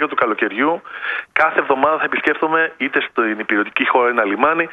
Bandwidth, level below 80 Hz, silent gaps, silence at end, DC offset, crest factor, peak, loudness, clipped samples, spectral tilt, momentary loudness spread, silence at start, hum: 6.8 kHz; -64 dBFS; none; 0 s; under 0.1%; 18 dB; 0 dBFS; -17 LUFS; under 0.1%; -6 dB/octave; 4 LU; 0 s; none